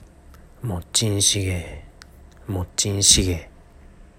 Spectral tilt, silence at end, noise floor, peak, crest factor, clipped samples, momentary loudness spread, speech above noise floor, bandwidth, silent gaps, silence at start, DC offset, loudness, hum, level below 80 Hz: -2.5 dB/octave; 0.15 s; -47 dBFS; 0 dBFS; 24 dB; under 0.1%; 18 LU; 25 dB; 16 kHz; none; 0.35 s; under 0.1%; -20 LUFS; none; -40 dBFS